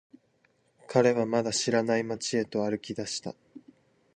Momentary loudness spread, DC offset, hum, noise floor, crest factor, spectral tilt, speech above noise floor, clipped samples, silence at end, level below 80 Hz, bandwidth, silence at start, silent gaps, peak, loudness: 11 LU; under 0.1%; none; -69 dBFS; 20 dB; -4 dB/octave; 41 dB; under 0.1%; 0.6 s; -70 dBFS; 10 kHz; 0.9 s; none; -10 dBFS; -28 LUFS